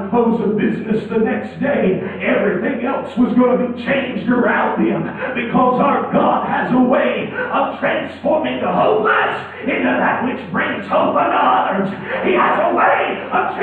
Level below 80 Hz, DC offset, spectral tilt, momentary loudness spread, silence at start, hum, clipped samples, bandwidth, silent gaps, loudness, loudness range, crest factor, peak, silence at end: -54 dBFS; under 0.1%; -8.5 dB/octave; 6 LU; 0 s; none; under 0.1%; 4.5 kHz; none; -17 LUFS; 1 LU; 14 dB; -2 dBFS; 0 s